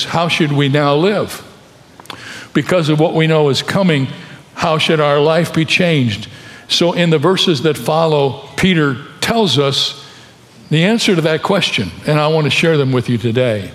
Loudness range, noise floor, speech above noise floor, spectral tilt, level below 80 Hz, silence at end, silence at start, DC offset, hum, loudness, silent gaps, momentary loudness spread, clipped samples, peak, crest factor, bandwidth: 2 LU; -42 dBFS; 28 dB; -5.5 dB/octave; -50 dBFS; 0 s; 0 s; under 0.1%; none; -14 LUFS; none; 10 LU; under 0.1%; 0 dBFS; 14 dB; 14.5 kHz